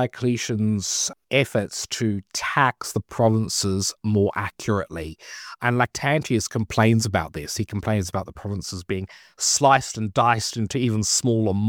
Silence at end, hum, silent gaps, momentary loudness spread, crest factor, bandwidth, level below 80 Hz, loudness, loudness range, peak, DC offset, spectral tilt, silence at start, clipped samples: 0 s; none; none; 11 LU; 20 dB; 18.5 kHz; -50 dBFS; -23 LUFS; 2 LU; -4 dBFS; under 0.1%; -4 dB/octave; 0 s; under 0.1%